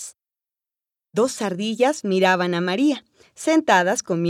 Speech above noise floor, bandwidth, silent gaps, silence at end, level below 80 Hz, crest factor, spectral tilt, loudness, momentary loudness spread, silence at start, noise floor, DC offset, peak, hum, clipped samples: 70 dB; 14.5 kHz; none; 0 s; -72 dBFS; 18 dB; -4.5 dB/octave; -21 LUFS; 11 LU; 0 s; -90 dBFS; under 0.1%; -2 dBFS; none; under 0.1%